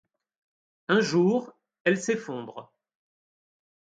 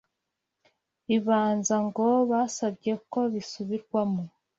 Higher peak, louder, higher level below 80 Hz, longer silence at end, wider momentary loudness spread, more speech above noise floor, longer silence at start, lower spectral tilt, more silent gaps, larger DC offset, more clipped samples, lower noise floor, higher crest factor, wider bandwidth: first, -8 dBFS vs -12 dBFS; about the same, -26 LUFS vs -27 LUFS; about the same, -76 dBFS vs -72 dBFS; first, 1.35 s vs 0.3 s; first, 19 LU vs 10 LU; first, over 65 dB vs 57 dB; second, 0.9 s vs 1.1 s; about the same, -5.5 dB/octave vs -5.5 dB/octave; first, 1.80-1.85 s vs none; neither; neither; first, under -90 dBFS vs -84 dBFS; about the same, 20 dB vs 16 dB; first, 9.4 kHz vs 8 kHz